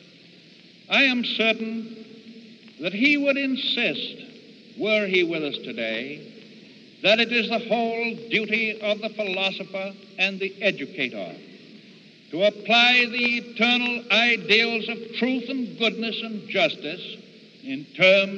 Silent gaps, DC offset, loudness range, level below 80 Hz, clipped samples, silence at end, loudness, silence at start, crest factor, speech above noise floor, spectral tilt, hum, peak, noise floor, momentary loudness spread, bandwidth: none; under 0.1%; 7 LU; -76 dBFS; under 0.1%; 0 s; -22 LUFS; 0.9 s; 20 dB; 27 dB; -4 dB/octave; none; -4 dBFS; -50 dBFS; 16 LU; 7.8 kHz